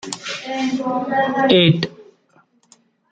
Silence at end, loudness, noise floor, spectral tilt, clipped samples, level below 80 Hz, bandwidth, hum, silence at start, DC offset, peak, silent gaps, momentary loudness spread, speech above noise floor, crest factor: 1.1 s; -18 LUFS; -57 dBFS; -5.5 dB/octave; under 0.1%; -60 dBFS; 9.2 kHz; none; 0.05 s; under 0.1%; -2 dBFS; none; 14 LU; 40 dB; 18 dB